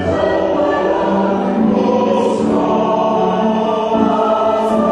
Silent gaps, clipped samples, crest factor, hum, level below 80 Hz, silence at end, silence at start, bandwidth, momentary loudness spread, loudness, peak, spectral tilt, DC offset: none; under 0.1%; 14 dB; none; -44 dBFS; 0 s; 0 s; 10.5 kHz; 1 LU; -15 LUFS; 0 dBFS; -7 dB/octave; under 0.1%